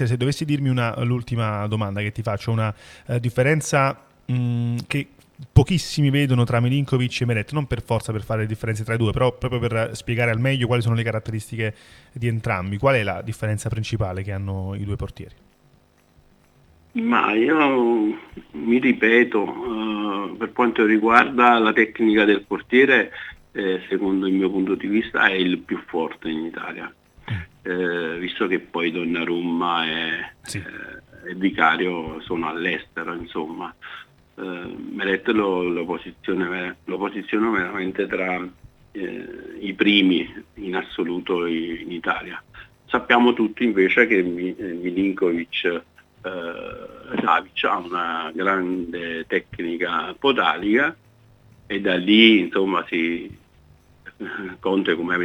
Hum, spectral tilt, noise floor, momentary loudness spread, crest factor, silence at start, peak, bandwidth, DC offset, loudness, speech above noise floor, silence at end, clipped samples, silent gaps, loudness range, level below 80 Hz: none; -6 dB/octave; -57 dBFS; 15 LU; 22 dB; 0 s; 0 dBFS; 14 kHz; under 0.1%; -22 LUFS; 36 dB; 0 s; under 0.1%; none; 7 LU; -48 dBFS